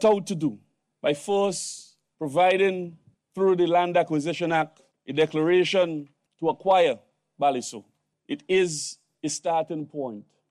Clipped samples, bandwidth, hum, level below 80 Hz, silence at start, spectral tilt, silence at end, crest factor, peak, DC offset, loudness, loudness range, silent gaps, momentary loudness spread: under 0.1%; 12.5 kHz; none; -72 dBFS; 0 s; -4.5 dB/octave; 0.3 s; 16 dB; -10 dBFS; under 0.1%; -25 LUFS; 3 LU; none; 15 LU